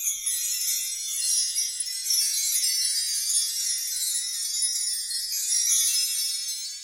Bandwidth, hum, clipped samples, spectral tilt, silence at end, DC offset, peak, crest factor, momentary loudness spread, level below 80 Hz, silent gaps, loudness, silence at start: 16 kHz; none; under 0.1%; 7.5 dB/octave; 0 s; under 0.1%; -10 dBFS; 18 dB; 6 LU; -72 dBFS; none; -23 LUFS; 0 s